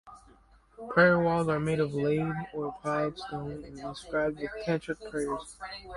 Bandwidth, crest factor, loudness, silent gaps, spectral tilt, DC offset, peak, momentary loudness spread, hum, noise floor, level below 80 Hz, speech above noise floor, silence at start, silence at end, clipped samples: 11.5 kHz; 22 dB; -30 LUFS; none; -6.5 dB/octave; under 0.1%; -8 dBFS; 17 LU; none; -59 dBFS; -56 dBFS; 30 dB; 0.05 s; 0 s; under 0.1%